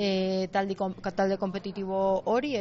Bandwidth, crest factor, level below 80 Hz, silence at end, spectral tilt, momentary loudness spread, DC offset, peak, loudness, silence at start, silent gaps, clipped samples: 7.4 kHz; 14 dB; -60 dBFS; 0 s; -4.5 dB/octave; 5 LU; under 0.1%; -14 dBFS; -29 LUFS; 0 s; none; under 0.1%